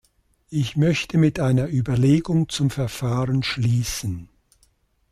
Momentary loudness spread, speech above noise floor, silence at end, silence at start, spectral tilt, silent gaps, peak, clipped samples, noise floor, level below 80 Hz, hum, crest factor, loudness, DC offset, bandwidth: 8 LU; 42 dB; 0.9 s; 0.5 s; -6 dB/octave; none; -8 dBFS; under 0.1%; -63 dBFS; -46 dBFS; none; 14 dB; -22 LUFS; under 0.1%; 14.5 kHz